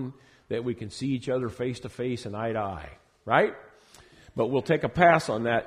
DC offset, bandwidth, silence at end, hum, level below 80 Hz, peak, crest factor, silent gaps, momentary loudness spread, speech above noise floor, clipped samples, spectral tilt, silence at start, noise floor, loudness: under 0.1%; 13 kHz; 0 s; none; -56 dBFS; -4 dBFS; 24 dB; none; 19 LU; 28 dB; under 0.1%; -6 dB/octave; 0 s; -55 dBFS; -27 LUFS